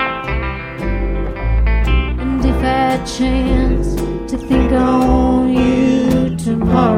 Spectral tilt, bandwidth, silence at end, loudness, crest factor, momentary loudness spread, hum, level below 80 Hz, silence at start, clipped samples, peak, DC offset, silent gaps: -7 dB/octave; 12 kHz; 0 s; -16 LUFS; 14 dB; 8 LU; none; -20 dBFS; 0 s; under 0.1%; 0 dBFS; under 0.1%; none